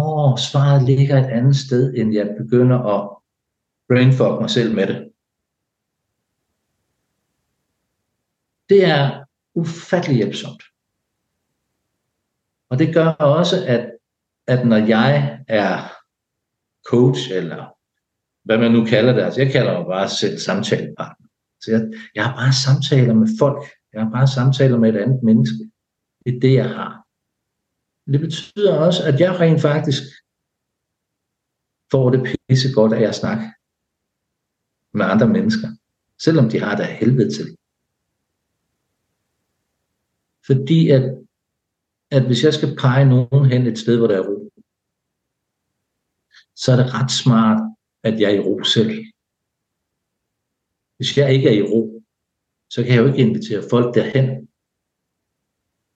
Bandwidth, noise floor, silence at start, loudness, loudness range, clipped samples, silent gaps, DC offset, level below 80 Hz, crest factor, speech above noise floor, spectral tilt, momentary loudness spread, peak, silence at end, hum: 8.2 kHz; -79 dBFS; 0 s; -17 LUFS; 5 LU; under 0.1%; none; under 0.1%; -62 dBFS; 16 dB; 63 dB; -6.5 dB/octave; 12 LU; -2 dBFS; 1.5 s; none